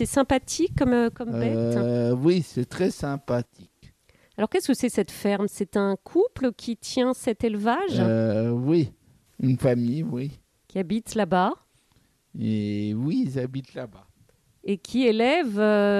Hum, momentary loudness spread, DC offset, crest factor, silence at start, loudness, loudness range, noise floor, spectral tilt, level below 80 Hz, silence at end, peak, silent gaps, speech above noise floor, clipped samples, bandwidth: none; 10 LU; under 0.1%; 18 dB; 0 s; -25 LUFS; 4 LU; -64 dBFS; -6 dB/octave; -52 dBFS; 0 s; -8 dBFS; none; 40 dB; under 0.1%; 14.5 kHz